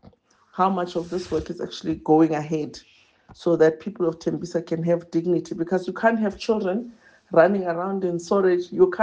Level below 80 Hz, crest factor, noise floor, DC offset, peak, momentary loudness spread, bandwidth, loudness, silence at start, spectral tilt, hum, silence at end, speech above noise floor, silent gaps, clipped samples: -56 dBFS; 20 dB; -54 dBFS; under 0.1%; -4 dBFS; 10 LU; 8.6 kHz; -23 LUFS; 0.55 s; -7 dB/octave; none; 0 s; 32 dB; none; under 0.1%